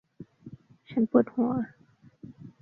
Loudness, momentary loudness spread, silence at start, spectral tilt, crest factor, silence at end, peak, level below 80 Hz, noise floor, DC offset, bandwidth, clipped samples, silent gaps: -27 LUFS; 25 LU; 0.2 s; -10.5 dB/octave; 22 dB; 0.15 s; -8 dBFS; -68 dBFS; -52 dBFS; under 0.1%; 4.1 kHz; under 0.1%; none